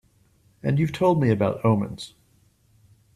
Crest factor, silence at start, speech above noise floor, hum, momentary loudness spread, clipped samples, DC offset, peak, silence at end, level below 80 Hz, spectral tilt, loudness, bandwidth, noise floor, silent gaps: 18 dB; 0.65 s; 39 dB; none; 14 LU; under 0.1%; under 0.1%; -8 dBFS; 1.05 s; -56 dBFS; -8 dB/octave; -23 LUFS; 13.5 kHz; -61 dBFS; none